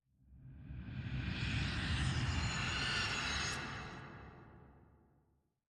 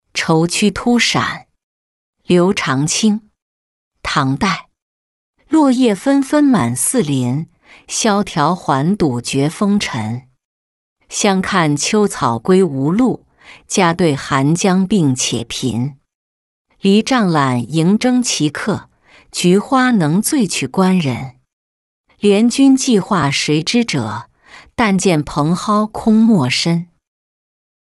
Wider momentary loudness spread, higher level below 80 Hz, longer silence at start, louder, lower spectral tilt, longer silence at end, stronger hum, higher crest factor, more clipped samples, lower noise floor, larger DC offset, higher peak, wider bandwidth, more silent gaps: first, 19 LU vs 9 LU; about the same, -50 dBFS vs -48 dBFS; first, 0.3 s vs 0.15 s; second, -38 LUFS vs -15 LUFS; second, -3.5 dB/octave vs -5 dB/octave; second, 0.9 s vs 1.15 s; neither; about the same, 16 dB vs 14 dB; neither; first, -77 dBFS vs -38 dBFS; neither; second, -24 dBFS vs -2 dBFS; about the same, 12 kHz vs 12 kHz; second, none vs 1.63-2.13 s, 3.42-3.91 s, 4.82-5.34 s, 10.45-10.96 s, 16.15-16.65 s, 21.53-22.04 s